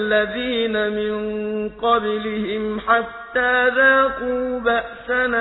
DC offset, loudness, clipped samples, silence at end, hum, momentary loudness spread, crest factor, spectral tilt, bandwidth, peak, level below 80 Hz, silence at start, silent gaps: under 0.1%; -20 LUFS; under 0.1%; 0 s; none; 10 LU; 16 dB; -7.5 dB/octave; 4.1 kHz; -4 dBFS; -48 dBFS; 0 s; none